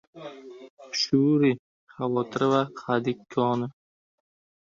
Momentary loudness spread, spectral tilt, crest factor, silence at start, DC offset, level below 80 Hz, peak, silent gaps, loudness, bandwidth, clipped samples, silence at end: 21 LU; -6 dB/octave; 20 dB; 0.15 s; under 0.1%; -68 dBFS; -8 dBFS; 0.70-0.77 s, 1.59-1.87 s; -26 LUFS; 7.4 kHz; under 0.1%; 1 s